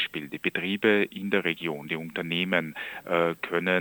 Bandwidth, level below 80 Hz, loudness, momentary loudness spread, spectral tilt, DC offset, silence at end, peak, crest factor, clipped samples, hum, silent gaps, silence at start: over 20 kHz; -70 dBFS; -27 LUFS; 9 LU; -6 dB/octave; under 0.1%; 0 s; -8 dBFS; 20 dB; under 0.1%; none; none; 0 s